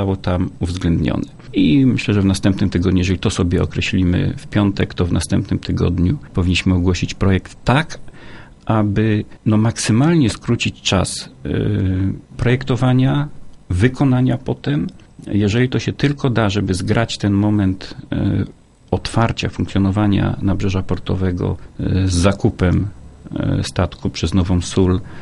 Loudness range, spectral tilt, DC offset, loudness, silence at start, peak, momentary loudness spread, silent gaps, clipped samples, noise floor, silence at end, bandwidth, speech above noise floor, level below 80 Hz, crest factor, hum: 2 LU; -6.5 dB/octave; under 0.1%; -18 LUFS; 0 s; 0 dBFS; 7 LU; none; under 0.1%; -37 dBFS; 0 s; 11.5 kHz; 20 dB; -34 dBFS; 16 dB; none